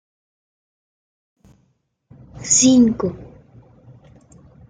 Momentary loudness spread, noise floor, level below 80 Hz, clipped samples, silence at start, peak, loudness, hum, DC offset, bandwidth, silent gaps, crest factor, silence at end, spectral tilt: 22 LU; -65 dBFS; -52 dBFS; under 0.1%; 2.35 s; -4 dBFS; -15 LUFS; none; under 0.1%; 9.8 kHz; none; 20 dB; 1.45 s; -3.5 dB/octave